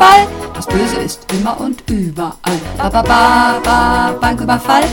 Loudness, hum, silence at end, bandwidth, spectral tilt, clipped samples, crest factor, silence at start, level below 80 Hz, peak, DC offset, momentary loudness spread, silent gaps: -13 LUFS; none; 0 s; 19.5 kHz; -4.5 dB/octave; 1%; 12 dB; 0 s; -28 dBFS; 0 dBFS; under 0.1%; 10 LU; none